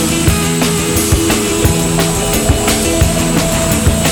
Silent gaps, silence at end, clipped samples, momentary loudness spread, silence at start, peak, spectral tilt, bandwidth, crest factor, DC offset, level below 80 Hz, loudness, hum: none; 0 s; under 0.1%; 1 LU; 0 s; 0 dBFS; -4 dB/octave; over 20 kHz; 12 dB; under 0.1%; -22 dBFS; -12 LUFS; none